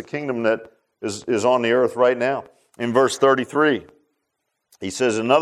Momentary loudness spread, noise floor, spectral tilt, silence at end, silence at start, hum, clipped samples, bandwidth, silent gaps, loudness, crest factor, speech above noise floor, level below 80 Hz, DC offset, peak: 12 LU; -76 dBFS; -4.5 dB/octave; 0 s; 0 s; none; under 0.1%; 13.5 kHz; none; -20 LUFS; 18 dB; 57 dB; -68 dBFS; under 0.1%; -2 dBFS